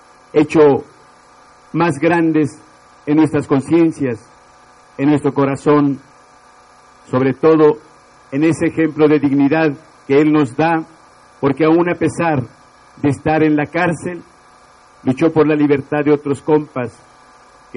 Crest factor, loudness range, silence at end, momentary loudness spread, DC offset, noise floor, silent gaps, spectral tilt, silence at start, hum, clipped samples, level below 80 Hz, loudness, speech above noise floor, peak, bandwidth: 16 dB; 3 LU; 0.85 s; 12 LU; under 0.1%; -46 dBFS; none; -7.5 dB/octave; 0.35 s; none; under 0.1%; -54 dBFS; -15 LUFS; 32 dB; 0 dBFS; 10.5 kHz